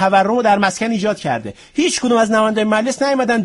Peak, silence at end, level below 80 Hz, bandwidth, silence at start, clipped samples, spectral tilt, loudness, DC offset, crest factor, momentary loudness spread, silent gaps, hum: -2 dBFS; 0 s; -54 dBFS; 11.5 kHz; 0 s; under 0.1%; -4 dB/octave; -16 LUFS; under 0.1%; 12 dB; 7 LU; none; none